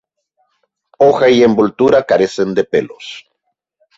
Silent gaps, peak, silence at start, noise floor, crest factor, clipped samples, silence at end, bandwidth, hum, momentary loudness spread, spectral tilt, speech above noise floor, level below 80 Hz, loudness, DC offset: none; 0 dBFS; 1 s; -71 dBFS; 14 dB; under 0.1%; 0.8 s; 8 kHz; none; 19 LU; -6 dB/octave; 59 dB; -52 dBFS; -12 LUFS; under 0.1%